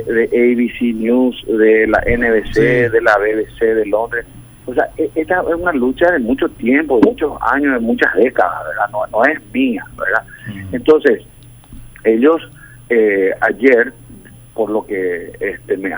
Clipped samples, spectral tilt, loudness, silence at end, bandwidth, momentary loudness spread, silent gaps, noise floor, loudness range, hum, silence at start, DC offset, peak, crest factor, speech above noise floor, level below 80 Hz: under 0.1%; -6.5 dB/octave; -15 LUFS; 0 s; over 20 kHz; 9 LU; none; -38 dBFS; 3 LU; none; 0 s; under 0.1%; 0 dBFS; 14 dB; 24 dB; -38 dBFS